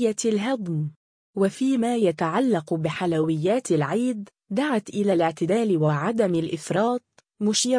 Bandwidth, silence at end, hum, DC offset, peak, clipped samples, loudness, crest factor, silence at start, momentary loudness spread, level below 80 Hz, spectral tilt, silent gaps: 10.5 kHz; 0 s; none; under 0.1%; -10 dBFS; under 0.1%; -24 LUFS; 14 dB; 0 s; 6 LU; -66 dBFS; -5.5 dB/octave; 0.96-1.34 s